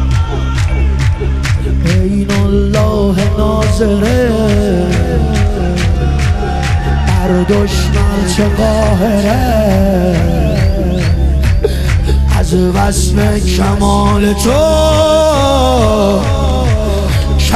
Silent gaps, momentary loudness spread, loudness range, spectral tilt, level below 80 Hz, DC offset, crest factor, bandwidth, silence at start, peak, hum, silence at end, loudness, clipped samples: none; 4 LU; 2 LU; -6 dB/octave; -16 dBFS; under 0.1%; 10 dB; 14.5 kHz; 0 s; 0 dBFS; none; 0 s; -12 LUFS; under 0.1%